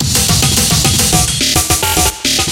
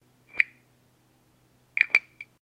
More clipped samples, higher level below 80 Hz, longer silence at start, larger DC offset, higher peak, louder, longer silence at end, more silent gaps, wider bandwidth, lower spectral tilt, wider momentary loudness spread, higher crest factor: neither; first, -24 dBFS vs -76 dBFS; second, 0 s vs 0.35 s; neither; about the same, 0 dBFS vs -2 dBFS; first, -10 LUFS vs -25 LUFS; second, 0 s vs 0.2 s; neither; first, 17.5 kHz vs 12 kHz; first, -2.5 dB/octave vs -1 dB/octave; second, 2 LU vs 21 LU; second, 12 dB vs 30 dB